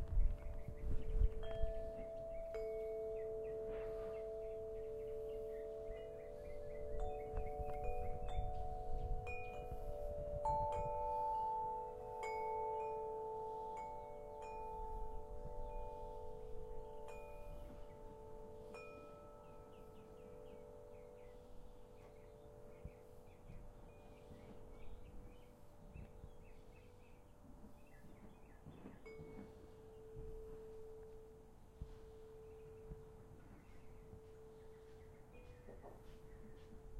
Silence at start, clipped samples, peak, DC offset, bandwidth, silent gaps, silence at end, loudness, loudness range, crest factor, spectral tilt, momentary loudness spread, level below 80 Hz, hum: 0 s; under 0.1%; -24 dBFS; under 0.1%; 13 kHz; none; 0 s; -48 LUFS; 17 LU; 22 dB; -7 dB/octave; 19 LU; -50 dBFS; none